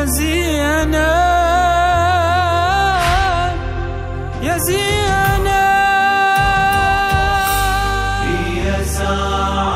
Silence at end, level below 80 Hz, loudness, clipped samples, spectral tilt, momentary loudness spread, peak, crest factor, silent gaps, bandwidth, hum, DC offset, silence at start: 0 s; -24 dBFS; -15 LUFS; under 0.1%; -4 dB/octave; 6 LU; -2 dBFS; 12 dB; none; 16 kHz; none; under 0.1%; 0 s